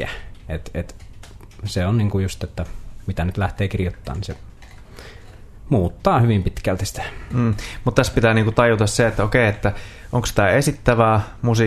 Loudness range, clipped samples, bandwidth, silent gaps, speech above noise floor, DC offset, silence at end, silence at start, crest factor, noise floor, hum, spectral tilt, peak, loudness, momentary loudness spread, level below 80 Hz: 8 LU; under 0.1%; 13.5 kHz; none; 21 dB; under 0.1%; 0 s; 0 s; 20 dB; -40 dBFS; none; -6 dB/octave; 0 dBFS; -20 LUFS; 16 LU; -34 dBFS